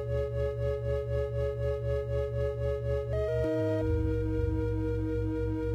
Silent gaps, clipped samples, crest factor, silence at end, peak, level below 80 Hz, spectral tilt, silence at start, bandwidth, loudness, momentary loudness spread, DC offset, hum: none; under 0.1%; 12 dB; 0 s; -18 dBFS; -38 dBFS; -9.5 dB/octave; 0 s; 8 kHz; -31 LUFS; 3 LU; under 0.1%; none